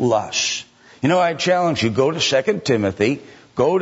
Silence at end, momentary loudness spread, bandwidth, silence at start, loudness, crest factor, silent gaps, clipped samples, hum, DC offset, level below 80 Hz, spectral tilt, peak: 0 s; 6 LU; 8 kHz; 0 s; -19 LUFS; 14 dB; none; under 0.1%; none; under 0.1%; -56 dBFS; -4 dB/octave; -4 dBFS